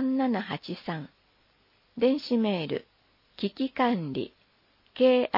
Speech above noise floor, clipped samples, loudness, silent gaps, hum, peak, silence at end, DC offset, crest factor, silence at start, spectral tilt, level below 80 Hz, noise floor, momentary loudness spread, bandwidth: 39 dB; under 0.1%; -28 LUFS; none; none; -10 dBFS; 0 s; under 0.1%; 20 dB; 0 s; -8 dB/octave; -72 dBFS; -66 dBFS; 14 LU; 5.8 kHz